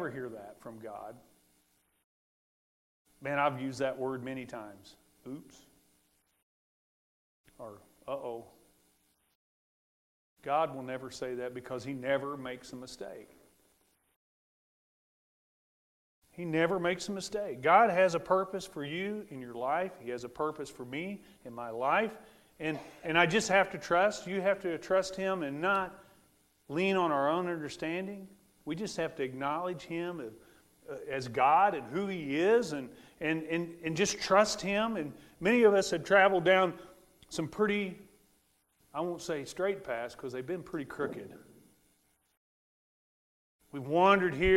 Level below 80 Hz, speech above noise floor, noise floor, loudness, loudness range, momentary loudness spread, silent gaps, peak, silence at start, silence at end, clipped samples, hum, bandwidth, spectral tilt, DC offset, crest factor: -62 dBFS; 41 dB; -73 dBFS; -31 LUFS; 18 LU; 20 LU; 2.04-3.05 s, 6.42-7.44 s, 9.35-10.36 s, 14.16-16.22 s, 42.37-43.59 s; -10 dBFS; 0 s; 0 s; under 0.1%; none; 16 kHz; -4.5 dB/octave; under 0.1%; 24 dB